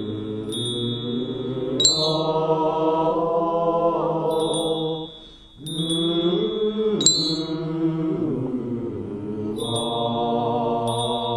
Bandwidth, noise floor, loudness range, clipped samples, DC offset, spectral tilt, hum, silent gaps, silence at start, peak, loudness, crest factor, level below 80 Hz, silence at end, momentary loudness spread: 13 kHz; -44 dBFS; 4 LU; under 0.1%; under 0.1%; -4.5 dB/octave; none; none; 0 s; 0 dBFS; -23 LUFS; 24 dB; -52 dBFS; 0 s; 11 LU